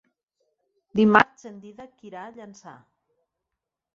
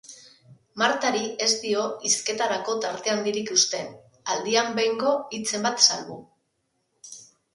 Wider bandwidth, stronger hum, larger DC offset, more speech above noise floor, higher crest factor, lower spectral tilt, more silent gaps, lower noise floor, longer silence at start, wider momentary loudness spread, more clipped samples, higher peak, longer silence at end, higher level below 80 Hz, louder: second, 7.4 kHz vs 11.5 kHz; neither; neither; first, 61 dB vs 49 dB; about the same, 26 dB vs 26 dB; first, -6.5 dB/octave vs -1 dB/octave; neither; first, -85 dBFS vs -74 dBFS; first, 0.95 s vs 0.1 s; first, 26 LU vs 21 LU; neither; about the same, -2 dBFS vs 0 dBFS; first, 1.25 s vs 0.3 s; first, -64 dBFS vs -74 dBFS; first, -20 LUFS vs -23 LUFS